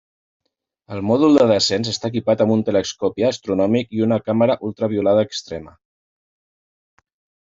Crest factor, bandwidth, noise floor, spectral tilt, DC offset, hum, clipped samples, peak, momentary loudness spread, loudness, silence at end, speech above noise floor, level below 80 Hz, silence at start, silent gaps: 16 dB; 7.8 kHz; under -90 dBFS; -5.5 dB/octave; under 0.1%; none; under 0.1%; -4 dBFS; 11 LU; -18 LUFS; 1.75 s; over 72 dB; -60 dBFS; 0.9 s; none